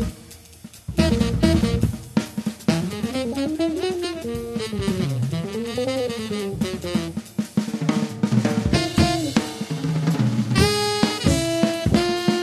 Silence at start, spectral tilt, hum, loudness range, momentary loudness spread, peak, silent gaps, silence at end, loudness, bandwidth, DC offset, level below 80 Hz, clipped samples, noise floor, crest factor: 0 s; -5.5 dB/octave; none; 5 LU; 9 LU; -2 dBFS; none; 0 s; -23 LUFS; 13.5 kHz; under 0.1%; -36 dBFS; under 0.1%; -44 dBFS; 20 dB